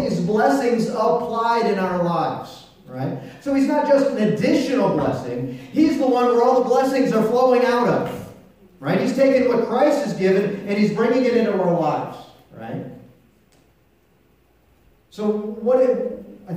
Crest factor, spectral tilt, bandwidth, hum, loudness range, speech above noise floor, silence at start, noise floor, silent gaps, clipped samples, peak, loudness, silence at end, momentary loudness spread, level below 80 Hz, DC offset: 14 dB; -6.5 dB/octave; 15.5 kHz; none; 8 LU; 40 dB; 0 s; -59 dBFS; none; under 0.1%; -6 dBFS; -19 LUFS; 0 s; 14 LU; -58 dBFS; under 0.1%